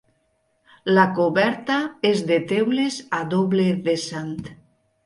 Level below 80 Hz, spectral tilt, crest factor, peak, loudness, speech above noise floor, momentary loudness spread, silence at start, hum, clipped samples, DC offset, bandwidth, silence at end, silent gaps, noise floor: -62 dBFS; -5.5 dB/octave; 18 dB; -4 dBFS; -21 LUFS; 47 dB; 12 LU; 0.85 s; none; under 0.1%; under 0.1%; 11.5 kHz; 0.5 s; none; -68 dBFS